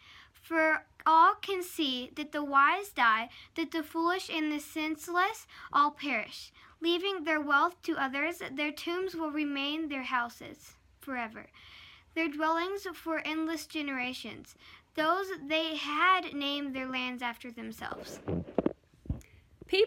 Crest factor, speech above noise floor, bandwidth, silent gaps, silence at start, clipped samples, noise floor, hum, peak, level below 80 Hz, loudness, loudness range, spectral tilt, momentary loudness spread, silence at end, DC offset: 20 dB; 23 dB; 16.5 kHz; none; 0.05 s; under 0.1%; -55 dBFS; none; -12 dBFS; -60 dBFS; -31 LUFS; 8 LU; -4 dB/octave; 16 LU; 0 s; under 0.1%